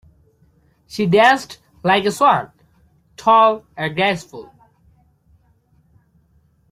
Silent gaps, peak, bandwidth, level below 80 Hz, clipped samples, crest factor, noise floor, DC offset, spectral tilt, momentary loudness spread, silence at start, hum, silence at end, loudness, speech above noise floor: none; -2 dBFS; 15.5 kHz; -58 dBFS; under 0.1%; 18 dB; -58 dBFS; under 0.1%; -5 dB/octave; 22 LU; 0.95 s; none; 2.3 s; -16 LUFS; 42 dB